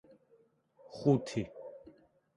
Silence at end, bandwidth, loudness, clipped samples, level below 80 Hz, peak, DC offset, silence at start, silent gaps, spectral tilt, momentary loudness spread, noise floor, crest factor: 0.45 s; 11 kHz; -33 LUFS; under 0.1%; -68 dBFS; -16 dBFS; under 0.1%; 0.9 s; none; -7.5 dB/octave; 22 LU; -68 dBFS; 22 dB